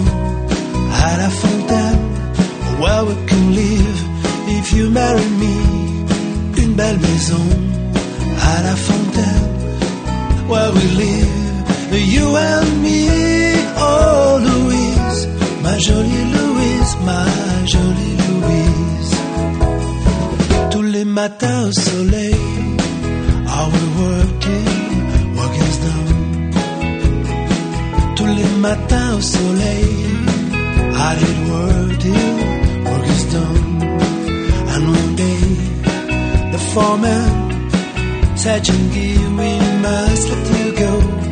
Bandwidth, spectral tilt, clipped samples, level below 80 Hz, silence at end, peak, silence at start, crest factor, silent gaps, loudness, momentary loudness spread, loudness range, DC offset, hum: 9.6 kHz; -5.5 dB/octave; under 0.1%; -22 dBFS; 0 s; 0 dBFS; 0 s; 14 dB; none; -15 LUFS; 5 LU; 3 LU; under 0.1%; none